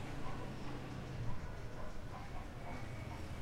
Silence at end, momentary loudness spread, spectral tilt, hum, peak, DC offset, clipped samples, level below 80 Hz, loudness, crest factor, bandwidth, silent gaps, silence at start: 0 s; 4 LU; -6 dB/octave; none; -26 dBFS; under 0.1%; under 0.1%; -50 dBFS; -48 LUFS; 16 dB; 14 kHz; none; 0 s